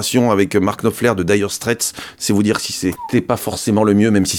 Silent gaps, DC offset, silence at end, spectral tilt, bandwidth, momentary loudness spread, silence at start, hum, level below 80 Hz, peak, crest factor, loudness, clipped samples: none; under 0.1%; 0 s; -4.5 dB/octave; 18.5 kHz; 7 LU; 0 s; none; -48 dBFS; -2 dBFS; 14 dB; -17 LUFS; under 0.1%